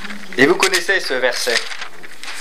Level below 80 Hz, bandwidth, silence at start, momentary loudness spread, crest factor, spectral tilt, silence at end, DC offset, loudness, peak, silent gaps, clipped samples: -66 dBFS; 16 kHz; 0 s; 17 LU; 18 dB; -2 dB/octave; 0 s; 5%; -16 LUFS; 0 dBFS; none; under 0.1%